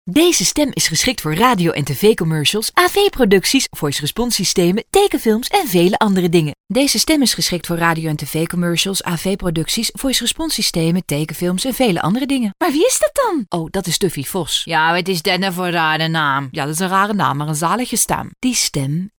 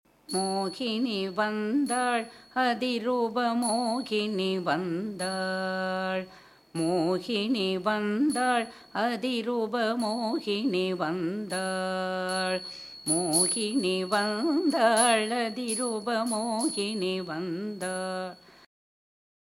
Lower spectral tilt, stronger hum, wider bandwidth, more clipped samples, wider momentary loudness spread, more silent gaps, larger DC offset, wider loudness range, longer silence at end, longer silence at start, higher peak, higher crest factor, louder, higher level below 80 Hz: about the same, -3.5 dB/octave vs -3.5 dB/octave; neither; first, over 20 kHz vs 16.5 kHz; neither; about the same, 6 LU vs 8 LU; first, 6.60-6.64 s vs none; neither; about the same, 3 LU vs 5 LU; second, 0.1 s vs 1.15 s; second, 0.05 s vs 0.3 s; first, 0 dBFS vs -8 dBFS; about the same, 16 dB vs 20 dB; first, -16 LUFS vs -28 LUFS; first, -40 dBFS vs -72 dBFS